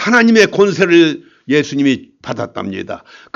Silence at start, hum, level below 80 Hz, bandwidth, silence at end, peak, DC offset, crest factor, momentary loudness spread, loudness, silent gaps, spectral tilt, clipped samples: 0 s; none; -58 dBFS; 7.6 kHz; 0.4 s; 0 dBFS; under 0.1%; 14 dB; 17 LU; -13 LUFS; none; -5 dB/octave; under 0.1%